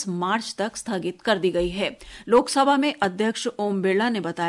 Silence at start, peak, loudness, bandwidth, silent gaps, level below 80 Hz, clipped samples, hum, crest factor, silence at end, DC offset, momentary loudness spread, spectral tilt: 0 s; -6 dBFS; -23 LUFS; 11.5 kHz; none; -50 dBFS; under 0.1%; none; 16 dB; 0 s; under 0.1%; 9 LU; -4.5 dB/octave